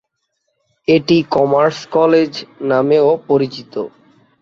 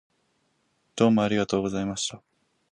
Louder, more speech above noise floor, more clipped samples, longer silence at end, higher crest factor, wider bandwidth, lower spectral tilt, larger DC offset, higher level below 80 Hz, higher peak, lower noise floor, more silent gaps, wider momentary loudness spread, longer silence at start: first, -15 LUFS vs -25 LUFS; first, 56 dB vs 47 dB; neither; about the same, 0.55 s vs 0.55 s; second, 14 dB vs 20 dB; second, 7.4 kHz vs 10.5 kHz; first, -6.5 dB/octave vs -5 dB/octave; neither; about the same, -58 dBFS vs -58 dBFS; first, -2 dBFS vs -6 dBFS; about the same, -70 dBFS vs -71 dBFS; neither; about the same, 12 LU vs 10 LU; about the same, 0.9 s vs 0.95 s